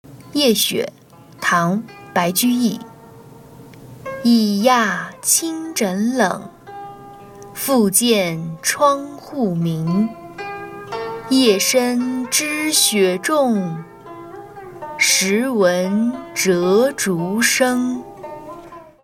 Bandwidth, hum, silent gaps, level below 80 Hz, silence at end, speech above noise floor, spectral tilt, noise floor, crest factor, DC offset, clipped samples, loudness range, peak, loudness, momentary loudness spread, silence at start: 17.5 kHz; none; none; -58 dBFS; 0.2 s; 24 dB; -3.5 dB/octave; -41 dBFS; 18 dB; under 0.1%; under 0.1%; 3 LU; 0 dBFS; -17 LUFS; 20 LU; 0.1 s